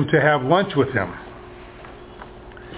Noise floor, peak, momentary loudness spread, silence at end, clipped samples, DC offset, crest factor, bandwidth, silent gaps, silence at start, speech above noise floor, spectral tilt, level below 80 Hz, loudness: -40 dBFS; -2 dBFS; 23 LU; 0 s; under 0.1%; under 0.1%; 20 dB; 4 kHz; none; 0 s; 21 dB; -10.5 dB/octave; -48 dBFS; -19 LUFS